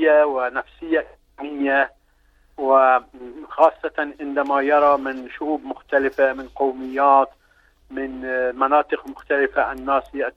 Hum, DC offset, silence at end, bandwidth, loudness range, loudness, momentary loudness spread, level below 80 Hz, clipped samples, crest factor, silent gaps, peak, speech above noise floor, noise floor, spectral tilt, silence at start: 50 Hz at -60 dBFS; under 0.1%; 0.05 s; 6 kHz; 2 LU; -20 LUFS; 13 LU; -54 dBFS; under 0.1%; 18 dB; none; -2 dBFS; 38 dB; -58 dBFS; -5.5 dB/octave; 0 s